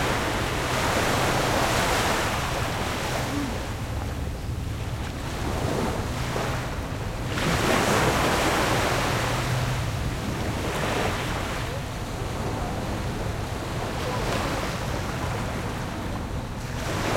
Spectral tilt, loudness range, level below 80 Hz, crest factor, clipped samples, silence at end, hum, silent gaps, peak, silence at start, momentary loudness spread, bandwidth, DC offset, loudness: -4.5 dB/octave; 6 LU; -36 dBFS; 18 dB; under 0.1%; 0 s; none; none; -8 dBFS; 0 s; 9 LU; 16.5 kHz; under 0.1%; -26 LUFS